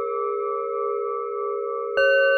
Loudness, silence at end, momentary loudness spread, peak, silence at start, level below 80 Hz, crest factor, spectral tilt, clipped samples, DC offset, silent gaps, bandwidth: -24 LUFS; 0 s; 8 LU; -8 dBFS; 0 s; -68 dBFS; 14 dB; -3 dB/octave; under 0.1%; under 0.1%; none; 6.4 kHz